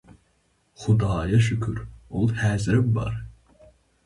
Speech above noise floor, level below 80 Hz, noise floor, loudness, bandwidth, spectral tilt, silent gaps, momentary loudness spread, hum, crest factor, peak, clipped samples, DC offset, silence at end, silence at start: 44 dB; -42 dBFS; -66 dBFS; -24 LUFS; 11.5 kHz; -7 dB/octave; none; 13 LU; none; 16 dB; -8 dBFS; under 0.1%; under 0.1%; 0.75 s; 0.8 s